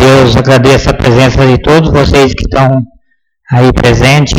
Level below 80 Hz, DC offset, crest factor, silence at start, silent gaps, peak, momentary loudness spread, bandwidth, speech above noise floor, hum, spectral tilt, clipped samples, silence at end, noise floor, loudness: -20 dBFS; under 0.1%; 6 dB; 0 s; none; 0 dBFS; 4 LU; 14.5 kHz; 48 dB; none; -6 dB/octave; 0.9%; 0 s; -54 dBFS; -6 LUFS